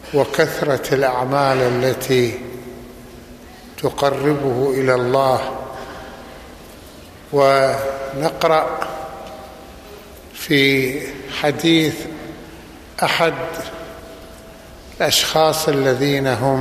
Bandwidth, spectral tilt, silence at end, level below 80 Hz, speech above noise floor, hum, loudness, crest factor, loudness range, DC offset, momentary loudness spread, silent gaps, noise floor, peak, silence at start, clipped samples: 15 kHz; -4.5 dB/octave; 0 s; -46 dBFS; 22 dB; none; -18 LUFS; 18 dB; 2 LU; under 0.1%; 23 LU; none; -39 dBFS; -2 dBFS; 0 s; under 0.1%